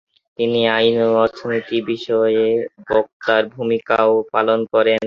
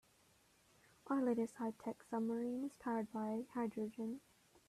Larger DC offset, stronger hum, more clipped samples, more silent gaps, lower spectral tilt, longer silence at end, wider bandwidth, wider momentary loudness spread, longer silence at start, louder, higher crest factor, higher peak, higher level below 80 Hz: neither; neither; neither; first, 3.13-3.20 s vs none; about the same, -6.5 dB/octave vs -7 dB/octave; second, 0 s vs 0.5 s; second, 6.8 kHz vs 13.5 kHz; about the same, 7 LU vs 8 LU; second, 0.4 s vs 1.05 s; first, -18 LUFS vs -42 LUFS; about the same, 16 dB vs 16 dB; first, -2 dBFS vs -28 dBFS; first, -58 dBFS vs -82 dBFS